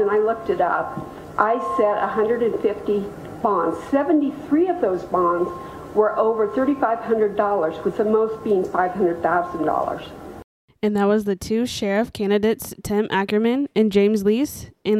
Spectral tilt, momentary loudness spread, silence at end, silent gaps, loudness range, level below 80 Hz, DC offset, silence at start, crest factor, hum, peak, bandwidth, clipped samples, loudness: -6 dB/octave; 7 LU; 0 s; 10.44-10.68 s; 2 LU; -52 dBFS; under 0.1%; 0 s; 20 dB; none; 0 dBFS; 15 kHz; under 0.1%; -21 LUFS